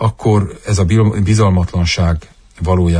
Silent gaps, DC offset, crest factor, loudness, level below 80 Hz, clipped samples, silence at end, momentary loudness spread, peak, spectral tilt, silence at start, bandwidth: none; under 0.1%; 12 dB; -14 LUFS; -28 dBFS; under 0.1%; 0 s; 6 LU; -2 dBFS; -6.5 dB/octave; 0 s; 10 kHz